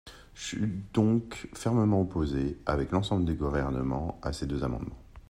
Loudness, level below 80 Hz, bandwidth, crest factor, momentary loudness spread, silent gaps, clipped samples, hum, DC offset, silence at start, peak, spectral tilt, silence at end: -30 LUFS; -42 dBFS; 14 kHz; 18 dB; 11 LU; none; under 0.1%; none; under 0.1%; 0.05 s; -12 dBFS; -7 dB/octave; 0.1 s